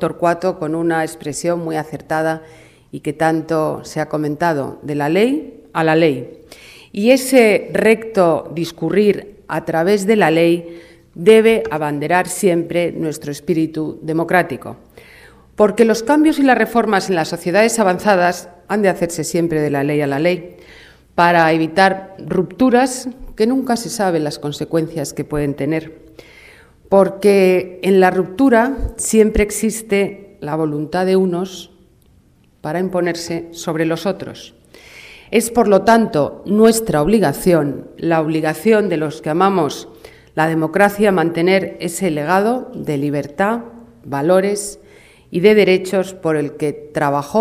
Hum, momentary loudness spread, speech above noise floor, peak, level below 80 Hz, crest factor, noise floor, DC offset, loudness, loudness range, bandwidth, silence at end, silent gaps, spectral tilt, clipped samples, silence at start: none; 11 LU; 36 dB; 0 dBFS; -42 dBFS; 16 dB; -52 dBFS; under 0.1%; -16 LUFS; 6 LU; 16 kHz; 0 s; none; -5.5 dB/octave; under 0.1%; 0 s